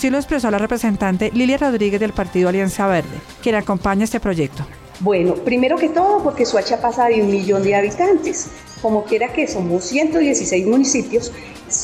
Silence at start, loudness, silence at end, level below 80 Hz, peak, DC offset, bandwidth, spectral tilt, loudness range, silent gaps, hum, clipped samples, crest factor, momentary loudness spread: 0 s; -18 LUFS; 0 s; -42 dBFS; -6 dBFS; under 0.1%; 15.5 kHz; -4.5 dB/octave; 3 LU; none; none; under 0.1%; 12 dB; 7 LU